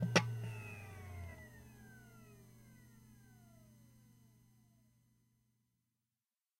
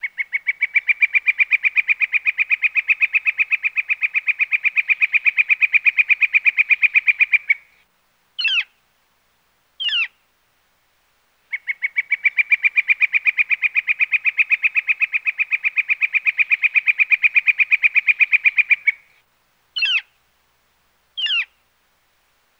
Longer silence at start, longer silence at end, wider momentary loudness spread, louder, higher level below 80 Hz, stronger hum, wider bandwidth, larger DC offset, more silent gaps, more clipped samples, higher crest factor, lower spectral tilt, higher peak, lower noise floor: about the same, 0 s vs 0.05 s; first, 2.75 s vs 1.15 s; first, 21 LU vs 8 LU; second, -42 LUFS vs -16 LUFS; first, -70 dBFS vs -76 dBFS; neither; about the same, 16 kHz vs 16 kHz; neither; neither; neither; first, 32 dB vs 16 dB; first, -4.5 dB/octave vs 3 dB/octave; second, -16 dBFS vs -4 dBFS; first, under -90 dBFS vs -63 dBFS